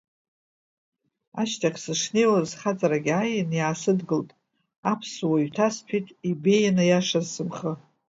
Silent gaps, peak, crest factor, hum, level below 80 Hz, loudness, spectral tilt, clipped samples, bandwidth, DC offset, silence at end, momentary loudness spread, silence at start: 4.78-4.83 s; -8 dBFS; 18 dB; none; -70 dBFS; -25 LUFS; -5 dB/octave; under 0.1%; 7.8 kHz; under 0.1%; 0.3 s; 10 LU; 1.35 s